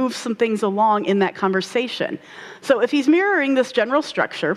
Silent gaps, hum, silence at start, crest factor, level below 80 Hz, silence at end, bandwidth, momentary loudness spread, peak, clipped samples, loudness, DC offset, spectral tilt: none; none; 0 s; 14 dB; -70 dBFS; 0 s; 13 kHz; 9 LU; -4 dBFS; under 0.1%; -19 LUFS; under 0.1%; -5 dB/octave